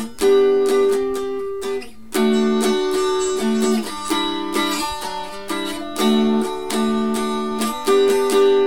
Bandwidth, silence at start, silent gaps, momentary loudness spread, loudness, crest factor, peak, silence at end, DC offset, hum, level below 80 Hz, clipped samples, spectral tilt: 18 kHz; 0 s; none; 10 LU; -19 LUFS; 14 dB; -6 dBFS; 0 s; 2%; none; -50 dBFS; under 0.1%; -4 dB/octave